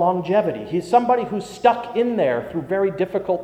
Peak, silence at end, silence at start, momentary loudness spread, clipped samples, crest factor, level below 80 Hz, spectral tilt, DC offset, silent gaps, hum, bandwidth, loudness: -2 dBFS; 0 s; 0 s; 7 LU; under 0.1%; 18 dB; -58 dBFS; -6.5 dB/octave; under 0.1%; none; none; 11.5 kHz; -21 LUFS